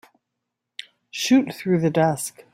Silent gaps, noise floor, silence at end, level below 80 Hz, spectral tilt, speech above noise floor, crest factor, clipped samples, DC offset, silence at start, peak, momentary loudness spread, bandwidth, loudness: none; -81 dBFS; 0.25 s; -66 dBFS; -5 dB/octave; 61 dB; 18 dB; under 0.1%; under 0.1%; 1.15 s; -6 dBFS; 20 LU; 16 kHz; -21 LUFS